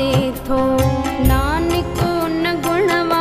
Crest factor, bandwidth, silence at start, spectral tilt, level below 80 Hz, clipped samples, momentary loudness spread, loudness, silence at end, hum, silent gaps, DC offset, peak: 14 dB; 15.5 kHz; 0 s; -6 dB/octave; -26 dBFS; under 0.1%; 3 LU; -18 LUFS; 0 s; none; none; under 0.1%; -2 dBFS